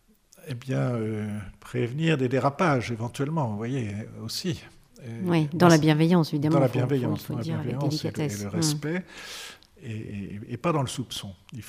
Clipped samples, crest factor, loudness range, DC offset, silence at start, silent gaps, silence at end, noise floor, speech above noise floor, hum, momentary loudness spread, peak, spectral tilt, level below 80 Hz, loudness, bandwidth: under 0.1%; 22 dB; 7 LU; under 0.1%; 0.45 s; none; 0 s; -48 dBFS; 22 dB; none; 17 LU; -6 dBFS; -6 dB/octave; -58 dBFS; -26 LUFS; 15.5 kHz